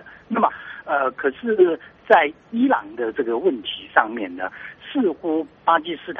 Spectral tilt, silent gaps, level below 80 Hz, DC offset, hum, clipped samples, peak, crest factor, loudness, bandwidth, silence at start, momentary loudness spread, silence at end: -2 dB/octave; none; -64 dBFS; under 0.1%; none; under 0.1%; 0 dBFS; 22 dB; -21 LUFS; 4.5 kHz; 0.05 s; 11 LU; 0 s